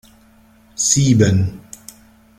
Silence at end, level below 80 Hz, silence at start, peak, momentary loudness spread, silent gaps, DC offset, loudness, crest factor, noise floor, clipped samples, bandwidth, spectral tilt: 0.8 s; -46 dBFS; 0.8 s; -2 dBFS; 24 LU; none; under 0.1%; -15 LUFS; 18 dB; -50 dBFS; under 0.1%; 15 kHz; -4.5 dB/octave